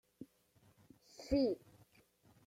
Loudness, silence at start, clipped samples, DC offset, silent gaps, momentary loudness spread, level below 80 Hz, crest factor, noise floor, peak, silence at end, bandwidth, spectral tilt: -38 LUFS; 0.2 s; under 0.1%; under 0.1%; none; 23 LU; -60 dBFS; 20 dB; -71 dBFS; -22 dBFS; 0.9 s; 15.5 kHz; -6.5 dB/octave